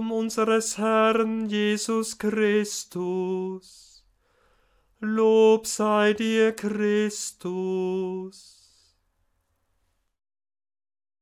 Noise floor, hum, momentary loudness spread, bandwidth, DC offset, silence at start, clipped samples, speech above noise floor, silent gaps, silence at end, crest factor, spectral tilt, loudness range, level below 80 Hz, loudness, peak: -72 dBFS; none; 11 LU; 16 kHz; under 0.1%; 0 s; under 0.1%; 48 dB; none; 2.85 s; 18 dB; -4.5 dB/octave; 11 LU; -68 dBFS; -24 LUFS; -8 dBFS